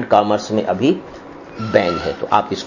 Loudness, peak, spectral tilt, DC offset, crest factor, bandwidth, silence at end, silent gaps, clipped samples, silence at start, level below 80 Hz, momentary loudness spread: -18 LUFS; 0 dBFS; -6 dB/octave; under 0.1%; 18 dB; 7.4 kHz; 0 s; none; under 0.1%; 0 s; -46 dBFS; 19 LU